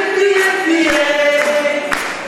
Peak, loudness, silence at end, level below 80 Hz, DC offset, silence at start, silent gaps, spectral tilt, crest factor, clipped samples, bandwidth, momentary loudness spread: 0 dBFS; -13 LUFS; 0 s; -48 dBFS; under 0.1%; 0 s; none; -2 dB/octave; 14 dB; under 0.1%; 15.5 kHz; 4 LU